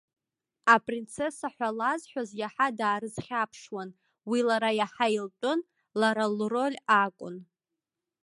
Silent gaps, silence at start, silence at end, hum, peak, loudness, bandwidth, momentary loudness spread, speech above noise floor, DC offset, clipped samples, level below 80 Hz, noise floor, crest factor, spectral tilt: none; 0.65 s; 0.8 s; none; -6 dBFS; -28 LUFS; 11.5 kHz; 15 LU; 59 dB; under 0.1%; under 0.1%; -74 dBFS; -88 dBFS; 24 dB; -4.5 dB/octave